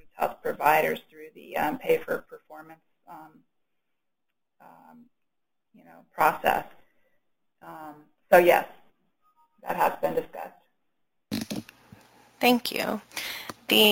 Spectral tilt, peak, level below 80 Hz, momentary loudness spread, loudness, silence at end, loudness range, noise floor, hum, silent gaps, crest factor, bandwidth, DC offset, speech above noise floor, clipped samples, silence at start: -3.5 dB/octave; -4 dBFS; -64 dBFS; 26 LU; -26 LUFS; 0 s; 8 LU; -85 dBFS; none; none; 24 dB; 17 kHz; under 0.1%; 60 dB; under 0.1%; 0.2 s